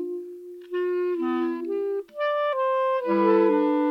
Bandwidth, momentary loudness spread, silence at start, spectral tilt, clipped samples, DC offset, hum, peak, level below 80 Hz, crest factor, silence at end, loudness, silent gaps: 5.6 kHz; 13 LU; 0 s; -7.5 dB/octave; under 0.1%; under 0.1%; none; -10 dBFS; -78 dBFS; 16 dB; 0 s; -24 LUFS; none